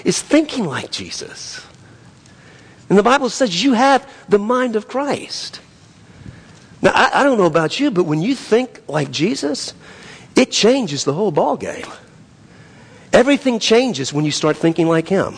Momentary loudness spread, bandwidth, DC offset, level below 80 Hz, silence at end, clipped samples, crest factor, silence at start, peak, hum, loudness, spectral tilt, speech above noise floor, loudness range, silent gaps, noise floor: 14 LU; 10.5 kHz; under 0.1%; -52 dBFS; 0 s; under 0.1%; 16 dB; 0.05 s; -2 dBFS; none; -16 LUFS; -4.5 dB/octave; 28 dB; 3 LU; none; -45 dBFS